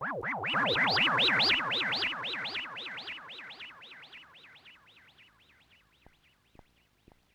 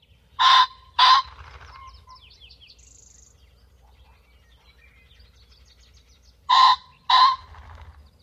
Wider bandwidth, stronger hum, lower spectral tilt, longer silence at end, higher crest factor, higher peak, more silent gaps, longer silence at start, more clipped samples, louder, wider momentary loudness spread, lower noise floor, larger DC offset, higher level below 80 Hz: first, over 20 kHz vs 9.2 kHz; neither; first, -3.5 dB/octave vs 0.5 dB/octave; first, 2.65 s vs 0.85 s; about the same, 18 dB vs 20 dB; second, -16 dBFS vs -4 dBFS; neither; second, 0 s vs 0.4 s; neither; second, -28 LUFS vs -18 LUFS; first, 24 LU vs 9 LU; first, -66 dBFS vs -56 dBFS; neither; second, -70 dBFS vs -52 dBFS